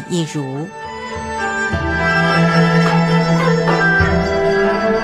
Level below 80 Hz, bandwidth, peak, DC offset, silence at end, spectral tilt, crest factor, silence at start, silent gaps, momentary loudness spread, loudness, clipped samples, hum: -34 dBFS; 10 kHz; 0 dBFS; under 0.1%; 0 s; -6 dB/octave; 14 dB; 0 s; none; 13 LU; -15 LUFS; under 0.1%; none